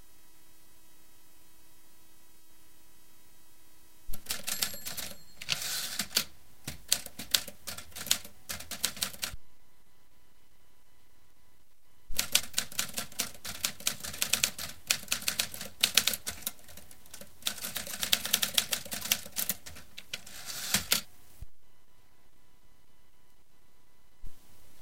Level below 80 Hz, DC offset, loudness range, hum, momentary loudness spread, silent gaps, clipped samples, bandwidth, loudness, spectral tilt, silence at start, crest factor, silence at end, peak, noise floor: -56 dBFS; 0.6%; 9 LU; none; 18 LU; none; under 0.1%; 17 kHz; -31 LUFS; 0.5 dB/octave; 3.85 s; 34 dB; 0 s; -2 dBFS; -67 dBFS